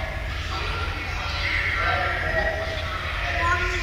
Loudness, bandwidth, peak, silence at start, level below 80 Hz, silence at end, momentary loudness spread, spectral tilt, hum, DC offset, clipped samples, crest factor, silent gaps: -25 LUFS; 16 kHz; -10 dBFS; 0 s; -32 dBFS; 0 s; 6 LU; -4.5 dB/octave; none; under 0.1%; under 0.1%; 14 dB; none